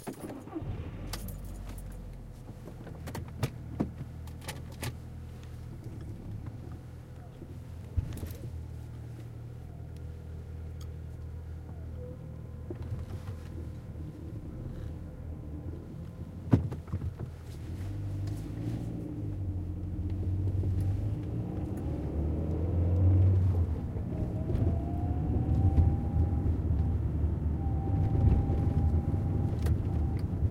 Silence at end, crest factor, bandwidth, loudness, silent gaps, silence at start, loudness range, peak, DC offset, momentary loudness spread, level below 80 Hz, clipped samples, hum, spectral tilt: 0 s; 24 dB; 15.5 kHz; -34 LUFS; none; 0 s; 13 LU; -8 dBFS; under 0.1%; 16 LU; -38 dBFS; under 0.1%; none; -8.5 dB/octave